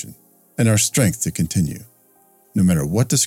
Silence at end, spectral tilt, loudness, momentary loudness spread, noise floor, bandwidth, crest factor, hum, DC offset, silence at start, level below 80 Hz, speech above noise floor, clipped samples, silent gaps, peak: 0 s; -4.5 dB/octave; -19 LUFS; 16 LU; -55 dBFS; 17 kHz; 14 dB; none; under 0.1%; 0 s; -46 dBFS; 37 dB; under 0.1%; none; -4 dBFS